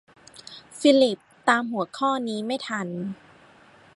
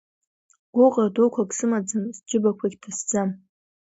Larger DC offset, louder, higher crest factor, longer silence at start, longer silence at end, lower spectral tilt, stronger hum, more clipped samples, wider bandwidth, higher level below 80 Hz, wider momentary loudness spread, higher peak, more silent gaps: neither; about the same, -24 LUFS vs -23 LUFS; first, 22 dB vs 16 dB; second, 0.35 s vs 0.75 s; first, 0.8 s vs 0.6 s; about the same, -4.5 dB/octave vs -5.5 dB/octave; neither; neither; first, 11.5 kHz vs 8 kHz; about the same, -74 dBFS vs -70 dBFS; first, 23 LU vs 11 LU; about the same, -4 dBFS vs -6 dBFS; neither